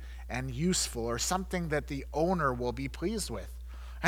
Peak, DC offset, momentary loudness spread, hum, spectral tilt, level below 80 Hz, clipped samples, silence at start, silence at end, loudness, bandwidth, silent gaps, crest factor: -10 dBFS; under 0.1%; 11 LU; none; -4 dB/octave; -42 dBFS; under 0.1%; 0 s; 0 s; -32 LUFS; 19 kHz; none; 24 dB